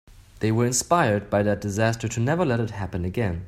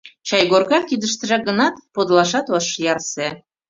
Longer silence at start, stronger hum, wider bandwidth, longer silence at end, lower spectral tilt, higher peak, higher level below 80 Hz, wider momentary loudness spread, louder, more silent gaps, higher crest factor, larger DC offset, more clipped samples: about the same, 0.1 s vs 0.05 s; neither; first, 15 kHz vs 7.8 kHz; second, 0 s vs 0.3 s; first, -5.5 dB/octave vs -3.5 dB/octave; second, -6 dBFS vs -2 dBFS; first, -48 dBFS vs -62 dBFS; about the same, 8 LU vs 8 LU; second, -24 LUFS vs -18 LUFS; neither; about the same, 18 dB vs 18 dB; neither; neither